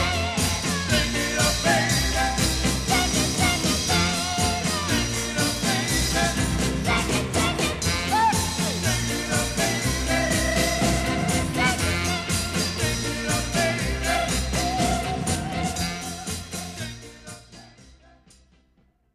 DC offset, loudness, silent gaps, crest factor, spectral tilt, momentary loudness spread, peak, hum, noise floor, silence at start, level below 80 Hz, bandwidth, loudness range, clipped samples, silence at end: under 0.1%; -23 LUFS; none; 16 dB; -3.5 dB/octave; 6 LU; -8 dBFS; none; -63 dBFS; 0 s; -34 dBFS; 15.5 kHz; 6 LU; under 0.1%; 1.25 s